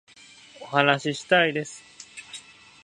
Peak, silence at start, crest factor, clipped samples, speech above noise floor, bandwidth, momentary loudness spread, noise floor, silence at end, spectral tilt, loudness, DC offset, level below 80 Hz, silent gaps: -2 dBFS; 0.6 s; 24 dB; under 0.1%; 27 dB; 11 kHz; 22 LU; -50 dBFS; 0.45 s; -4 dB/octave; -22 LUFS; under 0.1%; -72 dBFS; none